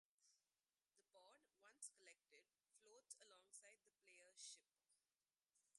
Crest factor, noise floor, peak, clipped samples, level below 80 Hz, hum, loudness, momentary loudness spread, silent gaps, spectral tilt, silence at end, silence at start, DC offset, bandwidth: 28 dB; under -90 dBFS; -44 dBFS; under 0.1%; under -90 dBFS; none; -63 LUFS; 7 LU; none; 2 dB/octave; 0 s; 0.2 s; under 0.1%; 11.5 kHz